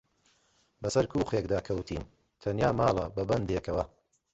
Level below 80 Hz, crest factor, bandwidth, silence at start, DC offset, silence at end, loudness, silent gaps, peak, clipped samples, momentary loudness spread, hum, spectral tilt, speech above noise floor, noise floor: -48 dBFS; 20 dB; 8.4 kHz; 0.8 s; under 0.1%; 0.45 s; -31 LUFS; none; -12 dBFS; under 0.1%; 12 LU; none; -6.5 dB/octave; 40 dB; -69 dBFS